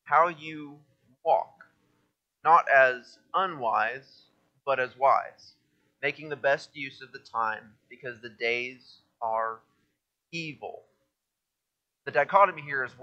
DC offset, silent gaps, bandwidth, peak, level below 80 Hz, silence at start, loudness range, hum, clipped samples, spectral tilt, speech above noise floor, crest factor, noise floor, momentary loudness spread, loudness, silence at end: under 0.1%; none; 8.4 kHz; -6 dBFS; -82 dBFS; 0.05 s; 9 LU; none; under 0.1%; -4.5 dB/octave; 58 dB; 22 dB; -85 dBFS; 20 LU; -27 LUFS; 0.15 s